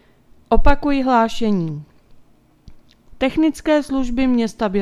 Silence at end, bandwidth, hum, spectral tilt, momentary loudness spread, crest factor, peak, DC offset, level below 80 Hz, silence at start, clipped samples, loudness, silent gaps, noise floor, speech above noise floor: 0 s; 11.5 kHz; none; -6.5 dB/octave; 6 LU; 18 dB; 0 dBFS; under 0.1%; -28 dBFS; 0.5 s; under 0.1%; -19 LUFS; none; -50 dBFS; 35 dB